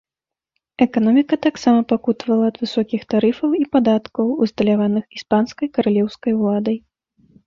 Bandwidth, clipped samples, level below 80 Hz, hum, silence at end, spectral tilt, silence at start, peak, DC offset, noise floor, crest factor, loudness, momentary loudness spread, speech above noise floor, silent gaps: 7.2 kHz; under 0.1%; -58 dBFS; none; 0.7 s; -7 dB/octave; 0.8 s; -2 dBFS; under 0.1%; -88 dBFS; 16 dB; -18 LUFS; 6 LU; 71 dB; none